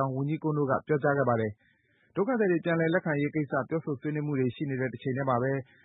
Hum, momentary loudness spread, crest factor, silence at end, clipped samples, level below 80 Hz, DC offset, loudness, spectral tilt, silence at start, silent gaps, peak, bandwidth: none; 6 LU; 18 dB; 0.2 s; under 0.1%; -68 dBFS; under 0.1%; -29 LUFS; -12 dB/octave; 0 s; none; -12 dBFS; 4 kHz